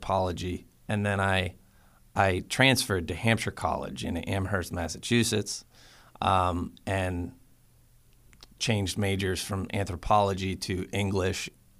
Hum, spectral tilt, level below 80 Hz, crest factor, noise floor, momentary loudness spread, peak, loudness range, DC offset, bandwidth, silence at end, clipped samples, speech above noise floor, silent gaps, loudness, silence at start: none; -4.5 dB/octave; -50 dBFS; 24 dB; -59 dBFS; 10 LU; -6 dBFS; 5 LU; under 0.1%; 15.5 kHz; 0.3 s; under 0.1%; 31 dB; none; -28 LUFS; 0 s